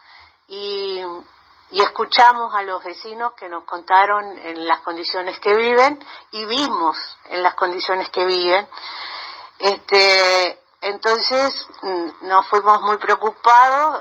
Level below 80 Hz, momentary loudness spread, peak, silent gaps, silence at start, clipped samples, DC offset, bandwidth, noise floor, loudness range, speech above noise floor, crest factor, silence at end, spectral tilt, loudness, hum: -68 dBFS; 17 LU; 0 dBFS; none; 0.5 s; under 0.1%; under 0.1%; 9.2 kHz; -48 dBFS; 4 LU; 30 dB; 18 dB; 0 s; -2 dB/octave; -17 LUFS; none